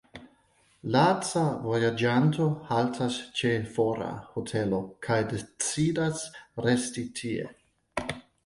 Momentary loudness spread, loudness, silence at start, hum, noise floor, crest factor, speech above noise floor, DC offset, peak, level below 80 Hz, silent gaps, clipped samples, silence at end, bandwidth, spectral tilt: 11 LU; -28 LUFS; 0.15 s; none; -65 dBFS; 20 dB; 38 dB; under 0.1%; -10 dBFS; -60 dBFS; none; under 0.1%; 0.25 s; 11.5 kHz; -5 dB/octave